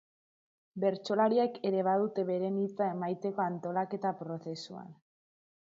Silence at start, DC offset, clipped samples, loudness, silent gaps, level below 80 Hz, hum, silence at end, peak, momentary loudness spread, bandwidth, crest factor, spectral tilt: 0.75 s; under 0.1%; under 0.1%; -32 LUFS; none; -84 dBFS; none; 0.75 s; -16 dBFS; 13 LU; 7.8 kHz; 16 dB; -7 dB/octave